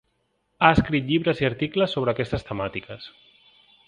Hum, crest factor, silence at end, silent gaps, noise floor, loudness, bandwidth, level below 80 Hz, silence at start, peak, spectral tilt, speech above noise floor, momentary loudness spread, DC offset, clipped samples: none; 24 dB; 0.8 s; none; -72 dBFS; -23 LUFS; 10 kHz; -46 dBFS; 0.6 s; 0 dBFS; -7.5 dB/octave; 48 dB; 18 LU; under 0.1%; under 0.1%